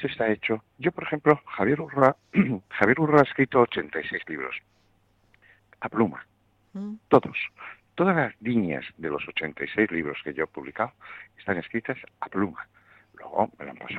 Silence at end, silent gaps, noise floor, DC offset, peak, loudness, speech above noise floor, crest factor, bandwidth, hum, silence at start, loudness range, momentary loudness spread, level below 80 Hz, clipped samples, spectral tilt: 0 s; none; -65 dBFS; under 0.1%; -2 dBFS; -26 LUFS; 39 dB; 24 dB; 7.8 kHz; none; 0 s; 9 LU; 16 LU; -62 dBFS; under 0.1%; -8.5 dB/octave